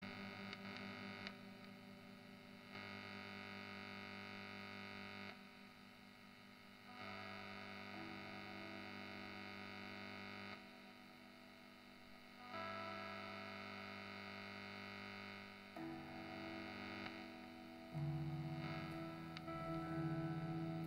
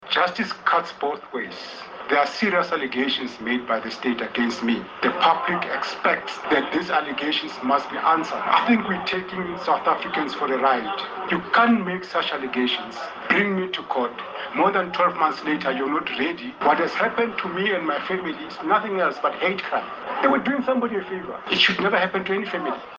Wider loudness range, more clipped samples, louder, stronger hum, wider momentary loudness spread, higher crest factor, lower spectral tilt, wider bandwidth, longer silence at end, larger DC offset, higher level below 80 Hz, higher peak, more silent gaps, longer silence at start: first, 6 LU vs 2 LU; neither; second, -51 LUFS vs -23 LUFS; neither; first, 14 LU vs 8 LU; about the same, 20 dB vs 20 dB; about the same, -6 dB/octave vs -5 dB/octave; first, 16 kHz vs 7.6 kHz; about the same, 0 s vs 0 s; neither; second, -78 dBFS vs -64 dBFS; second, -32 dBFS vs -2 dBFS; neither; about the same, 0 s vs 0 s